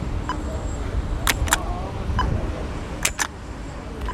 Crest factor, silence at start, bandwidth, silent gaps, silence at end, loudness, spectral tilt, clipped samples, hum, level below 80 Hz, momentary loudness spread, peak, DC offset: 24 dB; 0 s; 16.5 kHz; none; 0 s; -26 LUFS; -3.5 dB/octave; under 0.1%; none; -30 dBFS; 10 LU; 0 dBFS; under 0.1%